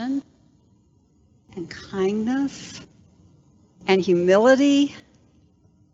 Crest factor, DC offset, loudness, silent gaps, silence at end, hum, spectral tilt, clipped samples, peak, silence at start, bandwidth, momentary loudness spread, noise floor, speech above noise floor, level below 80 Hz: 20 dB; under 0.1%; -20 LUFS; none; 0.95 s; none; -5.5 dB/octave; under 0.1%; -4 dBFS; 0 s; 7.8 kHz; 22 LU; -59 dBFS; 40 dB; -64 dBFS